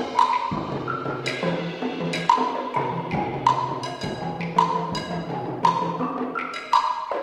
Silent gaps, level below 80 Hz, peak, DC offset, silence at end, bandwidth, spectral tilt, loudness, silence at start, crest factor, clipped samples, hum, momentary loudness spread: none; -56 dBFS; -4 dBFS; under 0.1%; 0 s; 12 kHz; -5.5 dB/octave; -25 LUFS; 0 s; 20 dB; under 0.1%; none; 8 LU